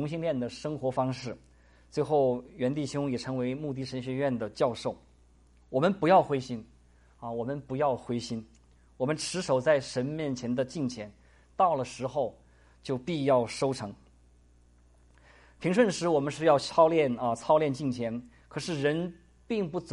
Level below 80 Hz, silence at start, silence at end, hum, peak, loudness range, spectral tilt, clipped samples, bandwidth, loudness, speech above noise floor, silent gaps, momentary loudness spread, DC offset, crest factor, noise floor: -60 dBFS; 0 s; 0 s; none; -10 dBFS; 6 LU; -6 dB/octave; under 0.1%; 11.5 kHz; -29 LUFS; 31 dB; none; 14 LU; under 0.1%; 20 dB; -60 dBFS